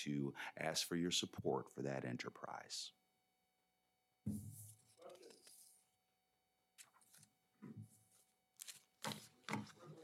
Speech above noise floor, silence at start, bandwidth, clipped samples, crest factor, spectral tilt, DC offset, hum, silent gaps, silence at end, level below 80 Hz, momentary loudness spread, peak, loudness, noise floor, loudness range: 40 dB; 0 s; 16 kHz; under 0.1%; 24 dB; -3.5 dB/octave; under 0.1%; 60 Hz at -80 dBFS; none; 0 s; -82 dBFS; 23 LU; -26 dBFS; -46 LUFS; -85 dBFS; 19 LU